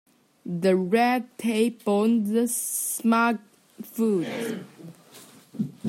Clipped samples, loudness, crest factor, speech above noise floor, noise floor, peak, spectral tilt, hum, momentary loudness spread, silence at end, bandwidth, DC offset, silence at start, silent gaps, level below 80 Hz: under 0.1%; -25 LUFS; 16 dB; 26 dB; -50 dBFS; -8 dBFS; -5 dB/octave; none; 17 LU; 0 s; 16.5 kHz; under 0.1%; 0.45 s; none; -76 dBFS